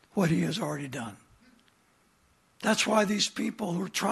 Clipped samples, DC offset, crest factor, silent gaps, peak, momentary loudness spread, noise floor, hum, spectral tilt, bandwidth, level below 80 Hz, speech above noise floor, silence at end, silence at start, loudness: under 0.1%; under 0.1%; 20 dB; none; -10 dBFS; 12 LU; -66 dBFS; none; -4 dB/octave; 13 kHz; -66 dBFS; 38 dB; 0 s; 0.15 s; -29 LUFS